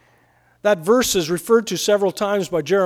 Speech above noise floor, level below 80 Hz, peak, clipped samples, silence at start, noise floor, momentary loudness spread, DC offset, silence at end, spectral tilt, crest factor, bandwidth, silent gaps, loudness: 39 dB; -54 dBFS; -4 dBFS; under 0.1%; 0.65 s; -57 dBFS; 5 LU; under 0.1%; 0 s; -3.5 dB/octave; 14 dB; 18 kHz; none; -19 LUFS